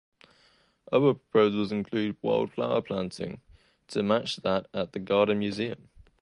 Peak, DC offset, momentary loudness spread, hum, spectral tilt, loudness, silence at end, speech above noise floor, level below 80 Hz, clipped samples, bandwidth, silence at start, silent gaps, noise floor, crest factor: -10 dBFS; under 0.1%; 11 LU; none; -6.5 dB/octave; -28 LUFS; 0.45 s; 37 dB; -62 dBFS; under 0.1%; 11 kHz; 0.9 s; none; -64 dBFS; 20 dB